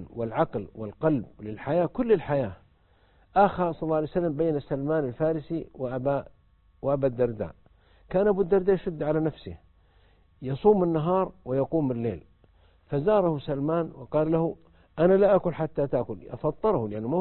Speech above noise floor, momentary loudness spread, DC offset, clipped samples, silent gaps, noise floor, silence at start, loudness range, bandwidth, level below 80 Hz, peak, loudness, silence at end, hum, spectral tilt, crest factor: 36 dB; 12 LU; under 0.1%; under 0.1%; none; -62 dBFS; 0 s; 3 LU; 4.3 kHz; -52 dBFS; -6 dBFS; -26 LUFS; 0 s; none; -12 dB/octave; 20 dB